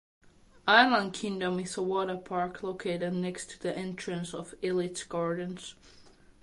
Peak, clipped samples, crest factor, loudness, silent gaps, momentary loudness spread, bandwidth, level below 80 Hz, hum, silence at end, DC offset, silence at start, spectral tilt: -6 dBFS; under 0.1%; 24 dB; -30 LUFS; none; 14 LU; 11.5 kHz; -64 dBFS; none; 0.3 s; under 0.1%; 0.65 s; -4.5 dB/octave